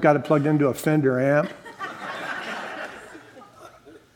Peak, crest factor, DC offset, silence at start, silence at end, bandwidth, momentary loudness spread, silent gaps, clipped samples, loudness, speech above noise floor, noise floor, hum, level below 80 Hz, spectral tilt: -4 dBFS; 20 dB; under 0.1%; 0 s; 0.2 s; 17.5 kHz; 17 LU; none; under 0.1%; -23 LUFS; 28 dB; -48 dBFS; none; -66 dBFS; -7 dB/octave